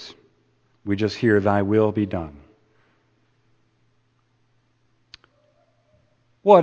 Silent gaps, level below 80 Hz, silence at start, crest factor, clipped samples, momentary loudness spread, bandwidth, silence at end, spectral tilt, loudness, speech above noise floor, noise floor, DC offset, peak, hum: none; -58 dBFS; 0 s; 24 dB; under 0.1%; 19 LU; 7.4 kHz; 0 s; -7.5 dB/octave; -21 LUFS; 45 dB; -65 dBFS; under 0.1%; 0 dBFS; none